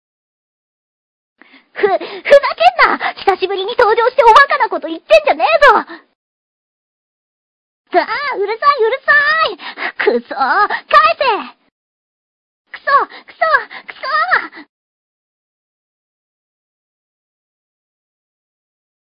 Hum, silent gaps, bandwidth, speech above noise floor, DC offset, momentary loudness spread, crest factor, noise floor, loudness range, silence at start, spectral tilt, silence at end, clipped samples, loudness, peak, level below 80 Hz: none; 6.15-7.85 s, 11.71-12.65 s; 12 kHz; over 77 dB; under 0.1%; 13 LU; 16 dB; under -90 dBFS; 8 LU; 1.75 s; -3 dB/octave; 4.45 s; 0.4%; -12 LUFS; 0 dBFS; -50 dBFS